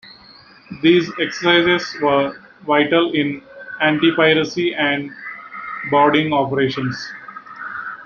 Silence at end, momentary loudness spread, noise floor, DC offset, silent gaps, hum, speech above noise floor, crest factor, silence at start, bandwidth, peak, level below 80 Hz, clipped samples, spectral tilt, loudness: 0 s; 17 LU; -45 dBFS; under 0.1%; none; none; 29 dB; 18 dB; 0.05 s; 7 kHz; -2 dBFS; -58 dBFS; under 0.1%; -5.5 dB/octave; -17 LUFS